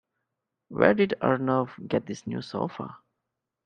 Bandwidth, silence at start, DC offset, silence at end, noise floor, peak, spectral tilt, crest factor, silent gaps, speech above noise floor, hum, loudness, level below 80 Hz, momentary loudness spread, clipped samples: 9.2 kHz; 0.7 s; under 0.1%; 0.7 s; -84 dBFS; -2 dBFS; -7 dB/octave; 26 dB; none; 58 dB; none; -26 LUFS; -64 dBFS; 16 LU; under 0.1%